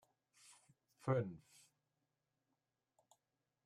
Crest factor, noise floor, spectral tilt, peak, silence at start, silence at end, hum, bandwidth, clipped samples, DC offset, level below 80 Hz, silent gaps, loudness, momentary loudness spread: 24 dB; -89 dBFS; -7.5 dB/octave; -26 dBFS; 0.5 s; 2.3 s; none; 12.5 kHz; under 0.1%; under 0.1%; -86 dBFS; none; -42 LUFS; 25 LU